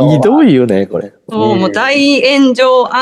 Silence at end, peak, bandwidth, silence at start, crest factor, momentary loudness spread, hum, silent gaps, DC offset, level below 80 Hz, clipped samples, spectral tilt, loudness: 0 s; 0 dBFS; 11.5 kHz; 0 s; 10 dB; 9 LU; none; none; under 0.1%; -52 dBFS; under 0.1%; -6 dB/octave; -9 LUFS